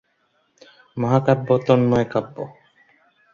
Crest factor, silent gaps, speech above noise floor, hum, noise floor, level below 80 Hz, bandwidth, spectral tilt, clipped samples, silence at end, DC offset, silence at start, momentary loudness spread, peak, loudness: 20 dB; none; 47 dB; none; -66 dBFS; -54 dBFS; 7.2 kHz; -8.5 dB/octave; under 0.1%; 0.8 s; under 0.1%; 0.95 s; 18 LU; -2 dBFS; -19 LUFS